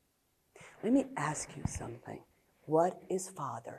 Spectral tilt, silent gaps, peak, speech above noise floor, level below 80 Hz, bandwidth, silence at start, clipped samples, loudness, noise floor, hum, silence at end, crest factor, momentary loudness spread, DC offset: -5.5 dB/octave; none; -16 dBFS; 41 dB; -58 dBFS; 13 kHz; 0.55 s; under 0.1%; -35 LUFS; -76 dBFS; none; 0 s; 20 dB; 19 LU; under 0.1%